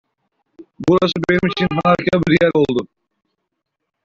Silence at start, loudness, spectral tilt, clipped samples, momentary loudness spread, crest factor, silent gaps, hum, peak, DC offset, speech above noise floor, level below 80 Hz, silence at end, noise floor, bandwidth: 0.6 s; -16 LUFS; -7 dB/octave; under 0.1%; 8 LU; 16 dB; none; none; -2 dBFS; under 0.1%; 61 dB; -48 dBFS; 1.2 s; -77 dBFS; 7.6 kHz